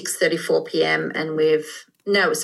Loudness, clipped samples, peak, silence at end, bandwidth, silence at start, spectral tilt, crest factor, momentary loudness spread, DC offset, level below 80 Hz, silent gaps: -21 LUFS; under 0.1%; -6 dBFS; 0 s; 12.5 kHz; 0 s; -3 dB/octave; 14 dB; 5 LU; under 0.1%; -80 dBFS; none